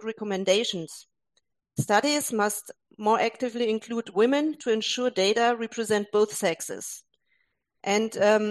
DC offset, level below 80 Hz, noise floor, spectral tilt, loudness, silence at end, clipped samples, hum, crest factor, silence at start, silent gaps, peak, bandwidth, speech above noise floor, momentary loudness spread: under 0.1%; -72 dBFS; -75 dBFS; -3.5 dB/octave; -26 LUFS; 0 s; under 0.1%; none; 18 dB; 0 s; none; -8 dBFS; 12.5 kHz; 49 dB; 13 LU